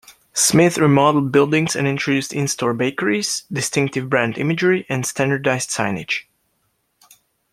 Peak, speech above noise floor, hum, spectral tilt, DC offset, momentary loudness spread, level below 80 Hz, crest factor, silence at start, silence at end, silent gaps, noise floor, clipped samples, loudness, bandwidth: -2 dBFS; 50 dB; none; -4.5 dB/octave; under 0.1%; 8 LU; -58 dBFS; 18 dB; 0.1 s; 1.3 s; none; -68 dBFS; under 0.1%; -18 LUFS; 16 kHz